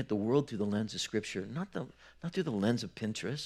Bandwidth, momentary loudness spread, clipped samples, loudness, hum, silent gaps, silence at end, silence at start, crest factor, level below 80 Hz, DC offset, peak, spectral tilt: 13 kHz; 10 LU; under 0.1%; -35 LUFS; none; none; 0 s; 0 s; 18 dB; -68 dBFS; under 0.1%; -16 dBFS; -5.5 dB/octave